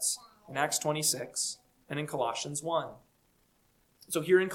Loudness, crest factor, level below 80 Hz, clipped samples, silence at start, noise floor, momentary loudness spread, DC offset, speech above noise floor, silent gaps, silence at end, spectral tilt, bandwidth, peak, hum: -32 LUFS; 20 dB; -74 dBFS; under 0.1%; 0 s; -70 dBFS; 12 LU; under 0.1%; 39 dB; none; 0 s; -3 dB/octave; 18 kHz; -12 dBFS; none